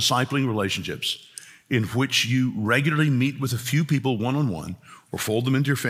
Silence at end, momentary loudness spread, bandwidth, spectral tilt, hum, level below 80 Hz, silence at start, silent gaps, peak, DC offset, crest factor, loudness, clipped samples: 0 s; 12 LU; 16.5 kHz; -5 dB/octave; none; -62 dBFS; 0 s; none; -6 dBFS; under 0.1%; 18 dB; -23 LUFS; under 0.1%